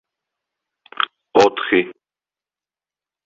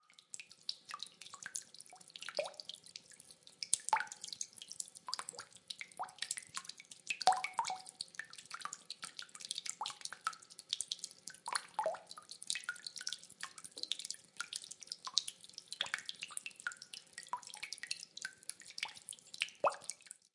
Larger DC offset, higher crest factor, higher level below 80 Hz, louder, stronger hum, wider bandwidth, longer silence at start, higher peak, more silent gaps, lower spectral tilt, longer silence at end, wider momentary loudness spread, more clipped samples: neither; second, 20 dB vs 36 dB; first, -60 dBFS vs under -90 dBFS; first, -18 LUFS vs -42 LUFS; first, 50 Hz at -55 dBFS vs none; second, 7.8 kHz vs 11.5 kHz; first, 1 s vs 0.1 s; first, -2 dBFS vs -8 dBFS; neither; first, -4 dB/octave vs 1.5 dB/octave; first, 1.35 s vs 0.2 s; second, 9 LU vs 13 LU; neither